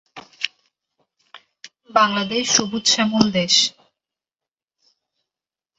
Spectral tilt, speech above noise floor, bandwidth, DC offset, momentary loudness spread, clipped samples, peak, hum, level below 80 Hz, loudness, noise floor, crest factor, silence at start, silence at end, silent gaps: -2.5 dB/octave; over 72 dB; 8.4 kHz; under 0.1%; 13 LU; under 0.1%; 0 dBFS; none; -62 dBFS; -18 LUFS; under -90 dBFS; 22 dB; 0.15 s; 2.1 s; none